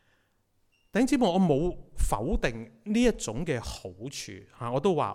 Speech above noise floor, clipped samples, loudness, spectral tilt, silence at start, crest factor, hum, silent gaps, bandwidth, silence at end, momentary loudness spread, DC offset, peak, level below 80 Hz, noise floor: 42 dB; under 0.1%; -28 LUFS; -5.5 dB/octave; 0.95 s; 16 dB; none; none; 15.5 kHz; 0 s; 15 LU; under 0.1%; -12 dBFS; -38 dBFS; -70 dBFS